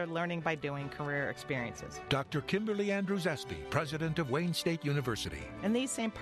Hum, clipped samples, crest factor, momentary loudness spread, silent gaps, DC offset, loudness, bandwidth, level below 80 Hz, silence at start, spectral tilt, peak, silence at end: none; under 0.1%; 20 dB; 5 LU; none; under 0.1%; -35 LUFS; 13.5 kHz; -58 dBFS; 0 s; -5 dB/octave; -16 dBFS; 0 s